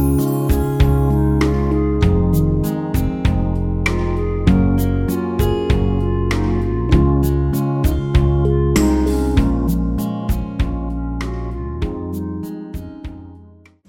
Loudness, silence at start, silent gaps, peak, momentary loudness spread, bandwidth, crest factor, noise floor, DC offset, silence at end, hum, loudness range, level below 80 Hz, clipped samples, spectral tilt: -18 LUFS; 0 s; none; 0 dBFS; 10 LU; 17.5 kHz; 16 dB; -44 dBFS; under 0.1%; 0.4 s; none; 7 LU; -22 dBFS; under 0.1%; -7.5 dB/octave